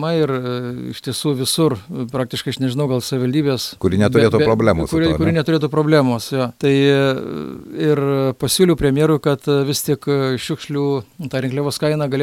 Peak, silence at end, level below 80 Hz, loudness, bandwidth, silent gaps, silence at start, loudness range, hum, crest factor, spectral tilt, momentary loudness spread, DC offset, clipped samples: 0 dBFS; 0 s; -42 dBFS; -18 LUFS; 17 kHz; none; 0 s; 4 LU; none; 16 dB; -5.5 dB/octave; 10 LU; under 0.1%; under 0.1%